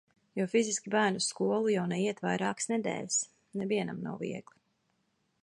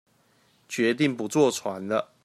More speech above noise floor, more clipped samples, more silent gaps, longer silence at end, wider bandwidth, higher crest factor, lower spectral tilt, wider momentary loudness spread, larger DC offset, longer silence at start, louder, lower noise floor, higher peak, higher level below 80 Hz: first, 45 dB vs 39 dB; neither; neither; first, 1 s vs 0.2 s; second, 11.5 kHz vs 15 kHz; about the same, 18 dB vs 18 dB; about the same, -4 dB/octave vs -4.5 dB/octave; first, 10 LU vs 7 LU; neither; second, 0.35 s vs 0.7 s; second, -32 LUFS vs -25 LUFS; first, -76 dBFS vs -64 dBFS; second, -14 dBFS vs -8 dBFS; about the same, -76 dBFS vs -74 dBFS